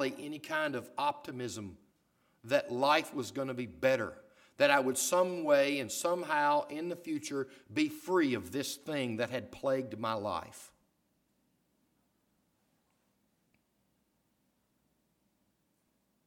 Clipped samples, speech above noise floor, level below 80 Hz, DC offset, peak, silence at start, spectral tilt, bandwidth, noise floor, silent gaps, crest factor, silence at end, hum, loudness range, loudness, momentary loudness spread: under 0.1%; 44 dB; -74 dBFS; under 0.1%; -10 dBFS; 0 s; -3.5 dB/octave; 17.5 kHz; -77 dBFS; none; 24 dB; 5.6 s; none; 9 LU; -33 LUFS; 12 LU